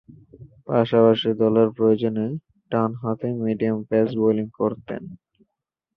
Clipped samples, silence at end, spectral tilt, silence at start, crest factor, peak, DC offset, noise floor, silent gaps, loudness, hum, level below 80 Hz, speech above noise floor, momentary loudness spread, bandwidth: under 0.1%; 0.8 s; -10 dB/octave; 0.4 s; 18 dB; -4 dBFS; under 0.1%; -83 dBFS; none; -21 LUFS; none; -60 dBFS; 62 dB; 16 LU; 5.4 kHz